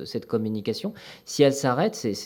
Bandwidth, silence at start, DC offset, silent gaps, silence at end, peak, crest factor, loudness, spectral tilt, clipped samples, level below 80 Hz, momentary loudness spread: 18.5 kHz; 0 s; under 0.1%; none; 0 s; -6 dBFS; 20 dB; -25 LUFS; -5 dB/octave; under 0.1%; -70 dBFS; 13 LU